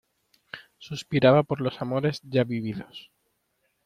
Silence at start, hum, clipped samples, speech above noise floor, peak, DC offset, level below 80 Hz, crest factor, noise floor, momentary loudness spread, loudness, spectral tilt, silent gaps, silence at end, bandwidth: 0.55 s; none; under 0.1%; 49 dB; -6 dBFS; under 0.1%; -64 dBFS; 20 dB; -74 dBFS; 24 LU; -25 LUFS; -7 dB/octave; none; 0.85 s; 12.5 kHz